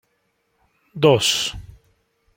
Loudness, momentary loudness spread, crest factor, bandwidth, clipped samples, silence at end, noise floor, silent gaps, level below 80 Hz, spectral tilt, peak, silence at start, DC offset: -18 LUFS; 24 LU; 22 dB; 16.5 kHz; under 0.1%; 0.75 s; -69 dBFS; none; -50 dBFS; -3.5 dB/octave; -2 dBFS; 0.95 s; under 0.1%